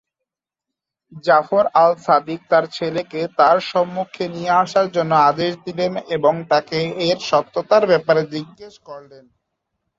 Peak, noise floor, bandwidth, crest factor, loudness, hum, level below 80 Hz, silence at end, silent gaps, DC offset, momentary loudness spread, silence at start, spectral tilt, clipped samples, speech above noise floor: 0 dBFS; -85 dBFS; 7.8 kHz; 18 dB; -18 LUFS; none; -64 dBFS; 1 s; none; under 0.1%; 11 LU; 1.15 s; -5.5 dB/octave; under 0.1%; 67 dB